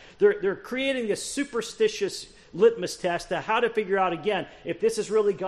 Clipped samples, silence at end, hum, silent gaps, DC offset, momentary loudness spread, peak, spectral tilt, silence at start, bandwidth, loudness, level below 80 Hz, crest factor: under 0.1%; 0 s; none; none; under 0.1%; 8 LU; -8 dBFS; -4 dB/octave; 0 s; 13 kHz; -26 LUFS; -60 dBFS; 18 dB